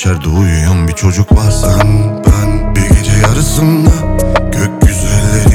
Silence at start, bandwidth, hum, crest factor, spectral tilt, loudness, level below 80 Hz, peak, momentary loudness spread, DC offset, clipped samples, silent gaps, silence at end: 0 s; 16.5 kHz; none; 8 dB; -6 dB/octave; -10 LUFS; -14 dBFS; 0 dBFS; 3 LU; under 0.1%; under 0.1%; none; 0 s